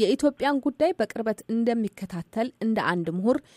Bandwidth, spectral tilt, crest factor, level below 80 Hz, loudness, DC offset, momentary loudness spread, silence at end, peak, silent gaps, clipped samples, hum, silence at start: 15 kHz; -6 dB/octave; 16 dB; -62 dBFS; -26 LUFS; under 0.1%; 7 LU; 0.15 s; -10 dBFS; none; under 0.1%; none; 0 s